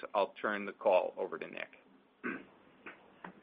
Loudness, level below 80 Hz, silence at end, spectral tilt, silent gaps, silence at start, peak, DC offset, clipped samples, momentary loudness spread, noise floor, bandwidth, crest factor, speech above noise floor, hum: -36 LUFS; -82 dBFS; 0.1 s; -2.5 dB/octave; none; 0 s; -16 dBFS; under 0.1%; under 0.1%; 22 LU; -57 dBFS; 4.9 kHz; 22 dB; 22 dB; none